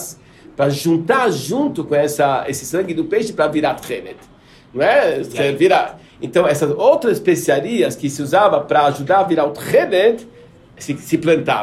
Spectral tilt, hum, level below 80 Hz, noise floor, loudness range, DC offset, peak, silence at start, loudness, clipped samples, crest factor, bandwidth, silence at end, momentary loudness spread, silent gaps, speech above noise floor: -5 dB/octave; none; -56 dBFS; -39 dBFS; 3 LU; under 0.1%; -2 dBFS; 0 s; -16 LUFS; under 0.1%; 16 dB; 15 kHz; 0 s; 13 LU; none; 23 dB